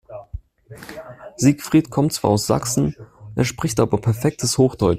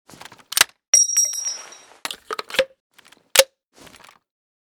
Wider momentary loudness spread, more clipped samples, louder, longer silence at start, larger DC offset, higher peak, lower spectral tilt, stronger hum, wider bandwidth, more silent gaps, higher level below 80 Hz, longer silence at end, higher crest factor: about the same, 20 LU vs 18 LU; neither; about the same, -20 LUFS vs -18 LUFS; second, 0.1 s vs 0.55 s; neither; about the same, -2 dBFS vs 0 dBFS; first, -5.5 dB/octave vs 2 dB/octave; neither; second, 16 kHz vs over 20 kHz; second, none vs 0.88-0.93 s, 2.80-2.90 s; first, -44 dBFS vs -62 dBFS; second, 0 s vs 1.2 s; second, 18 dB vs 24 dB